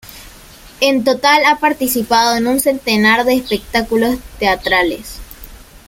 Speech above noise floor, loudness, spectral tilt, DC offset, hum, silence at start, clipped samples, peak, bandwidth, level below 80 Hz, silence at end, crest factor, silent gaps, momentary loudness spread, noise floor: 25 dB; -14 LUFS; -3 dB/octave; under 0.1%; none; 0.05 s; under 0.1%; 0 dBFS; 16.5 kHz; -40 dBFS; 0.1 s; 14 dB; none; 8 LU; -39 dBFS